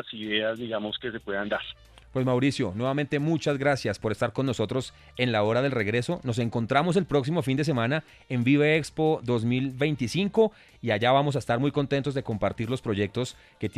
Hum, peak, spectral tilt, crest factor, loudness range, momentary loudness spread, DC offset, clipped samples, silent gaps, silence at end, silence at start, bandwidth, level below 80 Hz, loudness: none; -8 dBFS; -6.5 dB/octave; 18 dB; 3 LU; 8 LU; under 0.1%; under 0.1%; none; 0 s; 0.05 s; 13.5 kHz; -56 dBFS; -27 LUFS